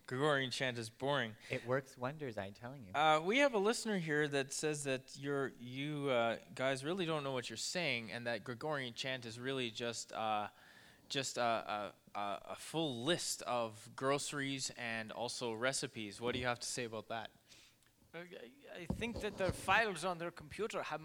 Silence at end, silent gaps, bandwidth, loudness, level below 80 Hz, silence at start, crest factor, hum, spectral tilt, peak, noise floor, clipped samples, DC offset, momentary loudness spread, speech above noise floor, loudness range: 0 s; none; over 20 kHz; -39 LUFS; -68 dBFS; 0.1 s; 22 dB; none; -3.5 dB/octave; -18 dBFS; -69 dBFS; under 0.1%; under 0.1%; 12 LU; 30 dB; 6 LU